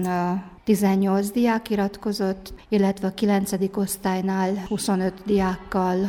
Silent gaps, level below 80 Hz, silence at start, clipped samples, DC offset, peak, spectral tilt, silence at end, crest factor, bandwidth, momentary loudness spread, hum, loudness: none; -50 dBFS; 0 s; under 0.1%; under 0.1%; -8 dBFS; -6 dB/octave; 0 s; 14 dB; 17 kHz; 5 LU; none; -23 LUFS